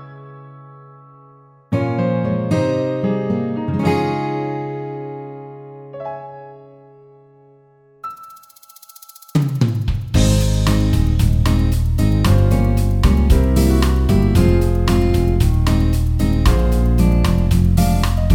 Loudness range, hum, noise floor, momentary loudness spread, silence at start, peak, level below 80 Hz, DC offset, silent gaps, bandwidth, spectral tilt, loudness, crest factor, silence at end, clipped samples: 18 LU; none; -51 dBFS; 17 LU; 0 s; 0 dBFS; -20 dBFS; under 0.1%; none; 17 kHz; -7 dB/octave; -17 LUFS; 16 dB; 0 s; under 0.1%